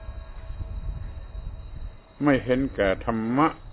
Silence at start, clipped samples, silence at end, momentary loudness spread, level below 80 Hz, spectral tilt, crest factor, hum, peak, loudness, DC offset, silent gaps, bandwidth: 0 s; under 0.1%; 0 s; 19 LU; -38 dBFS; -11 dB/octave; 18 dB; none; -8 dBFS; -25 LUFS; under 0.1%; none; 4 kHz